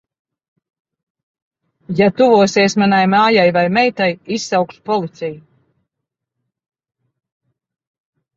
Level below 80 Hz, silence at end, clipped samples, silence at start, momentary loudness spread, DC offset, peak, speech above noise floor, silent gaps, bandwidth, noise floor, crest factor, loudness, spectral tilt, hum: -60 dBFS; 2.95 s; under 0.1%; 1.9 s; 12 LU; under 0.1%; 0 dBFS; 66 dB; none; 7.8 kHz; -80 dBFS; 16 dB; -14 LUFS; -5 dB/octave; none